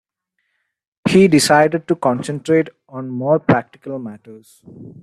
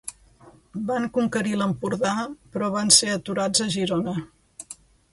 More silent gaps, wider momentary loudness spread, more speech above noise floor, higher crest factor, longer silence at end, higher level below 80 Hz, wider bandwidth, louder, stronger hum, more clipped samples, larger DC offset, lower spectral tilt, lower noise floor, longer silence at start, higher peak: neither; second, 18 LU vs 24 LU; first, 56 dB vs 29 dB; second, 16 dB vs 24 dB; second, 0.1 s vs 0.4 s; about the same, -54 dBFS vs -58 dBFS; about the same, 13 kHz vs 12 kHz; first, -16 LUFS vs -23 LUFS; neither; neither; neither; first, -5.5 dB/octave vs -3 dB/octave; first, -72 dBFS vs -52 dBFS; first, 1.05 s vs 0.05 s; about the same, -2 dBFS vs 0 dBFS